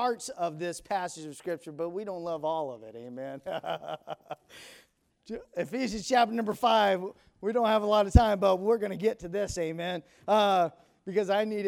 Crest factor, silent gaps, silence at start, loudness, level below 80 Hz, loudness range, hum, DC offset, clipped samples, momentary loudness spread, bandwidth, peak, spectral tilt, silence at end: 24 dB; none; 0 s; -29 LUFS; -40 dBFS; 11 LU; none; under 0.1%; under 0.1%; 18 LU; 16 kHz; -6 dBFS; -5.5 dB/octave; 0 s